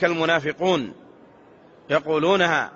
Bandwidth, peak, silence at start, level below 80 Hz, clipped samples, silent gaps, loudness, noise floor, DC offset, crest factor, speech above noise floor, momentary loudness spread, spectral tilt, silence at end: 7.6 kHz; -4 dBFS; 0 s; -64 dBFS; under 0.1%; none; -21 LUFS; -50 dBFS; under 0.1%; 18 dB; 29 dB; 6 LU; -2.5 dB/octave; 0.05 s